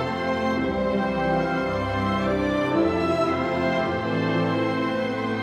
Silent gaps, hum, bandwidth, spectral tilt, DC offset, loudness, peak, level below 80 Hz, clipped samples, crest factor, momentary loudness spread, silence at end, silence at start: none; none; 12 kHz; -7 dB/octave; under 0.1%; -24 LUFS; -10 dBFS; -46 dBFS; under 0.1%; 12 dB; 3 LU; 0 s; 0 s